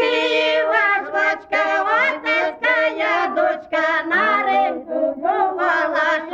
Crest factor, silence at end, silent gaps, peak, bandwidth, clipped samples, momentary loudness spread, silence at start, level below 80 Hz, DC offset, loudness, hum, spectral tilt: 12 dB; 0 s; none; -6 dBFS; 7.8 kHz; under 0.1%; 4 LU; 0 s; -64 dBFS; under 0.1%; -18 LUFS; none; -3 dB/octave